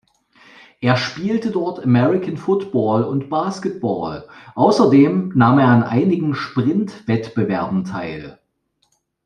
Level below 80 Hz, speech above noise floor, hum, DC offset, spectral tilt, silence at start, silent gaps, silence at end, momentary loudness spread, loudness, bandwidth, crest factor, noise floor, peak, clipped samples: -56 dBFS; 50 dB; none; under 0.1%; -7.5 dB/octave; 0.8 s; none; 0.9 s; 11 LU; -18 LUFS; 9.8 kHz; 16 dB; -67 dBFS; -2 dBFS; under 0.1%